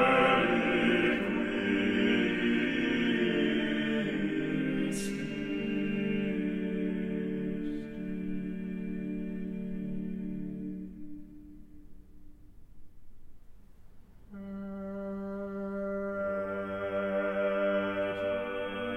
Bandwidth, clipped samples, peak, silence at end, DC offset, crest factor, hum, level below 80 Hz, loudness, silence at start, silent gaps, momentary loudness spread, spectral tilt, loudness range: 13.5 kHz; under 0.1%; -14 dBFS; 0 s; under 0.1%; 18 dB; none; -54 dBFS; -32 LUFS; 0 s; none; 12 LU; -6 dB/octave; 16 LU